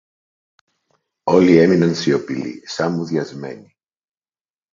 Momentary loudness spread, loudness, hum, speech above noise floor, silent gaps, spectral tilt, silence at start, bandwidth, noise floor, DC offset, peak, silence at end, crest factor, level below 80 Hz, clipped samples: 18 LU; -17 LUFS; none; over 74 dB; none; -6.5 dB/octave; 1.25 s; 7.6 kHz; under -90 dBFS; under 0.1%; 0 dBFS; 1.1 s; 20 dB; -58 dBFS; under 0.1%